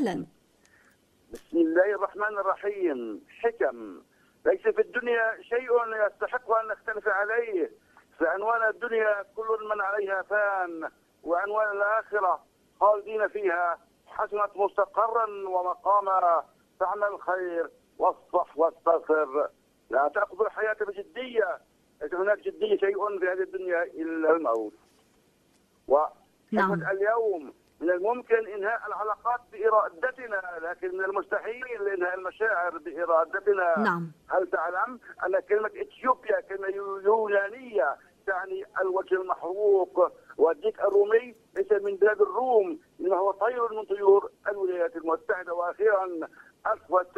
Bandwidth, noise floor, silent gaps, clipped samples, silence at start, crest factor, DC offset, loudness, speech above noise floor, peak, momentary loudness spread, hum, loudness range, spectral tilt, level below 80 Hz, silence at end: 8.4 kHz; -65 dBFS; none; under 0.1%; 0 s; 18 dB; under 0.1%; -27 LUFS; 38 dB; -8 dBFS; 9 LU; none; 3 LU; -7 dB/octave; -70 dBFS; 0.1 s